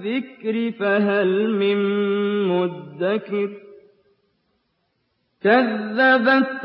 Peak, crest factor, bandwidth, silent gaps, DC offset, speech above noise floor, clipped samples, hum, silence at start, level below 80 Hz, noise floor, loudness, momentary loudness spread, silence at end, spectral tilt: -4 dBFS; 18 dB; 5.6 kHz; none; under 0.1%; 51 dB; under 0.1%; none; 0 s; -76 dBFS; -70 dBFS; -20 LUFS; 10 LU; 0 s; -10.5 dB/octave